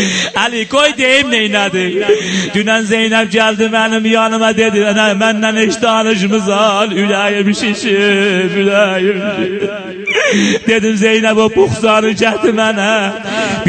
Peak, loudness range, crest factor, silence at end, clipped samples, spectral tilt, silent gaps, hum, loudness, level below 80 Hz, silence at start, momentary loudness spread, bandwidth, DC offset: 0 dBFS; 1 LU; 12 dB; 0 s; under 0.1%; -4 dB/octave; none; none; -11 LUFS; -50 dBFS; 0 s; 4 LU; 9.2 kHz; under 0.1%